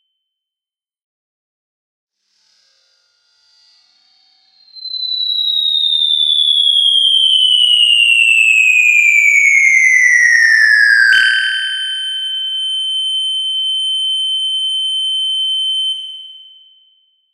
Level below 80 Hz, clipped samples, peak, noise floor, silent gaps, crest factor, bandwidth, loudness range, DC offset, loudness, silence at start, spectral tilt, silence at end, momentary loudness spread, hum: -70 dBFS; under 0.1%; 0 dBFS; -89 dBFS; none; 14 dB; 16.5 kHz; 9 LU; under 0.1%; -10 LUFS; 4.75 s; 7 dB/octave; 0.95 s; 10 LU; none